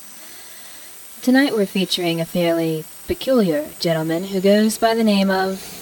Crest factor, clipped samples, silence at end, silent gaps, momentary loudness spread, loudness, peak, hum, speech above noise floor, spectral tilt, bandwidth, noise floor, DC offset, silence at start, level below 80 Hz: 16 dB; under 0.1%; 0 s; none; 19 LU; -19 LUFS; -4 dBFS; none; 20 dB; -5 dB/octave; over 20 kHz; -38 dBFS; under 0.1%; 0 s; -52 dBFS